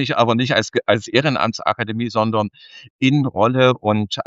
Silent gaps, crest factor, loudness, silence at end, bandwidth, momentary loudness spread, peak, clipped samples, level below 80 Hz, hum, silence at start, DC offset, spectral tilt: 2.90-2.99 s; 18 dB; -18 LUFS; 0.05 s; 7.8 kHz; 6 LU; 0 dBFS; under 0.1%; -58 dBFS; none; 0 s; under 0.1%; -6 dB/octave